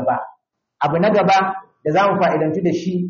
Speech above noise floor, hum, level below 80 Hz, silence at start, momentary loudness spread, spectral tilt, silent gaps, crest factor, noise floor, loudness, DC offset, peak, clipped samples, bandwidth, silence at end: 39 dB; none; -60 dBFS; 0 s; 10 LU; -5 dB/octave; none; 12 dB; -56 dBFS; -18 LUFS; under 0.1%; -6 dBFS; under 0.1%; 7.2 kHz; 0 s